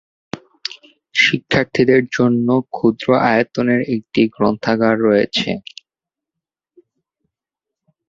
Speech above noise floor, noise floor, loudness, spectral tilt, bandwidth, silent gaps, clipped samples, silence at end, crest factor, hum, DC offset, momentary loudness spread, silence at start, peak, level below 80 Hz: 71 dB; -87 dBFS; -16 LUFS; -6 dB/octave; 7.6 kHz; none; under 0.1%; 2.5 s; 16 dB; none; under 0.1%; 15 LU; 0.35 s; -2 dBFS; -54 dBFS